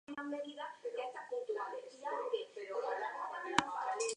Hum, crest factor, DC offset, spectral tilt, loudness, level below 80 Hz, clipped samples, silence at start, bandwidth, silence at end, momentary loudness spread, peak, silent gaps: none; 30 dB; under 0.1%; -2.5 dB/octave; -41 LUFS; -78 dBFS; under 0.1%; 0.1 s; 10.5 kHz; 0 s; 8 LU; -10 dBFS; none